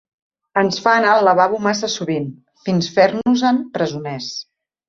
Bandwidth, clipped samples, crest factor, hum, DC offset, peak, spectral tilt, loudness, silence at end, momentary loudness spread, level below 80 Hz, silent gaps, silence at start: 7.6 kHz; under 0.1%; 16 dB; none; under 0.1%; -2 dBFS; -5 dB/octave; -17 LUFS; 0.45 s; 13 LU; -60 dBFS; none; 0.55 s